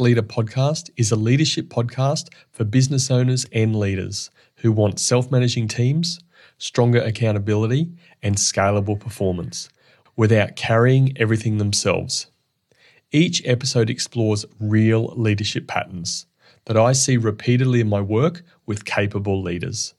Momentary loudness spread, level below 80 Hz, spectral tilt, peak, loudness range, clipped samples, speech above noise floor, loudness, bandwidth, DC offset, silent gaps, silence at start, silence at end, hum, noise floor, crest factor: 10 LU; -58 dBFS; -5 dB/octave; -4 dBFS; 2 LU; under 0.1%; 44 dB; -20 LUFS; 12 kHz; under 0.1%; none; 0 s; 0.1 s; none; -63 dBFS; 16 dB